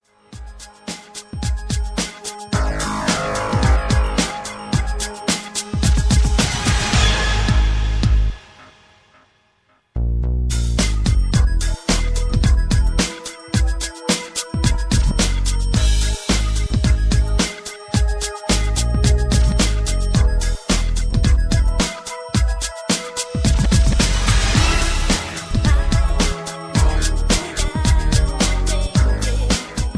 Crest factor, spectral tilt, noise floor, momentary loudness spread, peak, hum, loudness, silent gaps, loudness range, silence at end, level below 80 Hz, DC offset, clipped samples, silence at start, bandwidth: 14 dB; -4.5 dB/octave; -60 dBFS; 8 LU; -2 dBFS; none; -19 LUFS; none; 4 LU; 0 s; -20 dBFS; under 0.1%; under 0.1%; 0.3 s; 11 kHz